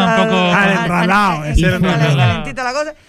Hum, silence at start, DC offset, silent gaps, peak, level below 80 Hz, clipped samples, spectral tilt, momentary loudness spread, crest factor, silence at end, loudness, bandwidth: none; 0 s; under 0.1%; none; -2 dBFS; -26 dBFS; under 0.1%; -6 dB/octave; 7 LU; 12 dB; 0.15 s; -14 LUFS; 14.5 kHz